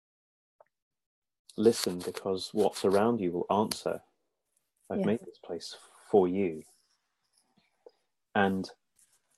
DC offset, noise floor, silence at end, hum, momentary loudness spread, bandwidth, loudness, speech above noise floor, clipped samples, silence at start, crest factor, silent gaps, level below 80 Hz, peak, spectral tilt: under 0.1%; -79 dBFS; 0.65 s; none; 15 LU; 13.5 kHz; -30 LUFS; 50 dB; under 0.1%; 1.55 s; 22 dB; none; -72 dBFS; -10 dBFS; -5 dB/octave